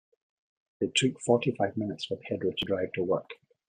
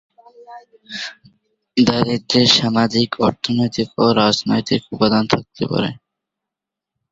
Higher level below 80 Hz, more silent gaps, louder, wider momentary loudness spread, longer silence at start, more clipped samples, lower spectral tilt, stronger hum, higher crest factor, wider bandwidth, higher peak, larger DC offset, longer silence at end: second, -68 dBFS vs -52 dBFS; neither; second, -30 LUFS vs -17 LUFS; second, 8 LU vs 13 LU; first, 0.8 s vs 0.4 s; neither; about the same, -4.5 dB/octave vs -5 dB/octave; neither; about the same, 20 dB vs 18 dB; first, 10.5 kHz vs 7.8 kHz; second, -10 dBFS vs 0 dBFS; neither; second, 0.35 s vs 1.15 s